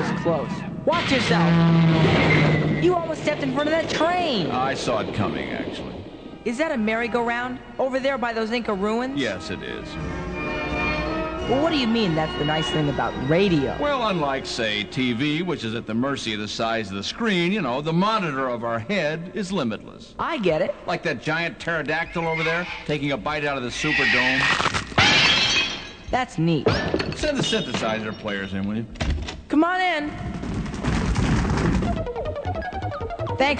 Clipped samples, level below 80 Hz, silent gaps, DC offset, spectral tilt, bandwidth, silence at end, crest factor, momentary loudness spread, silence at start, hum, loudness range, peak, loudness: under 0.1%; -38 dBFS; none; 0.1%; -5 dB/octave; 9.4 kHz; 0 s; 18 dB; 11 LU; 0 s; none; 6 LU; -6 dBFS; -23 LUFS